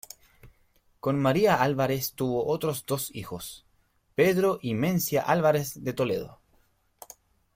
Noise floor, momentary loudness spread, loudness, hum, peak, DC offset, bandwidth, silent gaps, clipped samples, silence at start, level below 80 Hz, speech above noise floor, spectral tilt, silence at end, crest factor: -68 dBFS; 17 LU; -26 LUFS; none; -8 dBFS; under 0.1%; 16.5 kHz; none; under 0.1%; 0.45 s; -60 dBFS; 42 dB; -5.5 dB/octave; 1.25 s; 20 dB